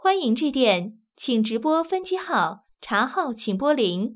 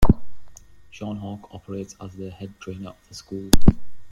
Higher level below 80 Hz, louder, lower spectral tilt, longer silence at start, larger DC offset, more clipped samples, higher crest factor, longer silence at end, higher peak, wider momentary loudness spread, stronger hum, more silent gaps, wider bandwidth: second, -66 dBFS vs -28 dBFS; first, -23 LUFS vs -27 LUFS; first, -9.5 dB/octave vs -6 dB/octave; about the same, 0.05 s vs 0 s; neither; neither; about the same, 16 dB vs 20 dB; about the same, 0 s vs 0 s; second, -6 dBFS vs 0 dBFS; second, 7 LU vs 19 LU; neither; neither; second, 4 kHz vs 16 kHz